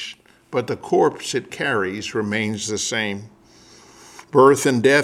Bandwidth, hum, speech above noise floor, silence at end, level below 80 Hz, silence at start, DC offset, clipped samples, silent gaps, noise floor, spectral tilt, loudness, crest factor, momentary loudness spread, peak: 15 kHz; none; 30 dB; 0 s; -62 dBFS; 0 s; under 0.1%; under 0.1%; none; -49 dBFS; -4 dB/octave; -20 LUFS; 20 dB; 12 LU; -2 dBFS